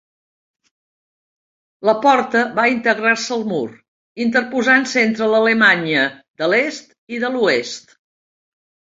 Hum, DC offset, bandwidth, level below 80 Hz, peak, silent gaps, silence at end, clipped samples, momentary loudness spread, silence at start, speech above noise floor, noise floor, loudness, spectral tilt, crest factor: none; under 0.1%; 7.8 kHz; -66 dBFS; 0 dBFS; 3.88-4.15 s, 6.28-6.34 s, 6.98-7.07 s; 1.2 s; under 0.1%; 11 LU; 1.8 s; over 73 dB; under -90 dBFS; -16 LUFS; -4 dB/octave; 18 dB